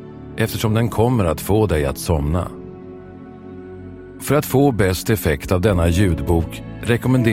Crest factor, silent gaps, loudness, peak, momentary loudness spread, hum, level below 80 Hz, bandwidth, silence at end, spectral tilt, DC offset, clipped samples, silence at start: 18 dB; none; -19 LUFS; -2 dBFS; 20 LU; none; -32 dBFS; 16.5 kHz; 0 s; -6.5 dB/octave; under 0.1%; under 0.1%; 0 s